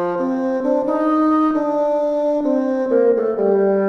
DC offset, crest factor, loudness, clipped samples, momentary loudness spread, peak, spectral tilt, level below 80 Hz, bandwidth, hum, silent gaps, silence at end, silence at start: under 0.1%; 12 dB; -18 LUFS; under 0.1%; 4 LU; -6 dBFS; -8.5 dB/octave; -56 dBFS; 6.4 kHz; none; none; 0 s; 0 s